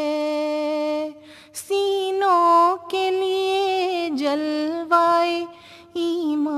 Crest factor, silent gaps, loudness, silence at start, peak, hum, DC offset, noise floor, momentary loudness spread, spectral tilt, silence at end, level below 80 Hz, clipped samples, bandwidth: 16 dB; none; -21 LUFS; 0 s; -4 dBFS; none; under 0.1%; -43 dBFS; 11 LU; -3 dB/octave; 0 s; -70 dBFS; under 0.1%; 13.5 kHz